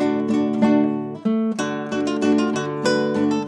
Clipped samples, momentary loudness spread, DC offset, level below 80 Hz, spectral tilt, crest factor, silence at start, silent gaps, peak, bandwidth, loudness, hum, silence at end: under 0.1%; 6 LU; under 0.1%; -70 dBFS; -6 dB/octave; 16 dB; 0 s; none; -4 dBFS; 10 kHz; -21 LUFS; none; 0 s